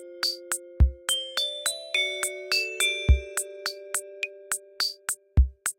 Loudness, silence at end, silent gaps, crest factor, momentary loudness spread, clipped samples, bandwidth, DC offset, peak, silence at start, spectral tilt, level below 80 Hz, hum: -27 LUFS; 0.05 s; none; 20 dB; 8 LU; under 0.1%; 16.5 kHz; under 0.1%; -8 dBFS; 0 s; -2.5 dB/octave; -30 dBFS; none